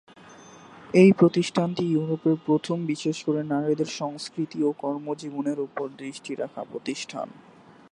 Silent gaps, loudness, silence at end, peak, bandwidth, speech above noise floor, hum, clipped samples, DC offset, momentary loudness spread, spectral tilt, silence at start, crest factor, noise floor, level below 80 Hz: none; -25 LUFS; 0.55 s; -4 dBFS; 11 kHz; 24 dB; none; under 0.1%; under 0.1%; 15 LU; -6.5 dB/octave; 0.3 s; 20 dB; -48 dBFS; -70 dBFS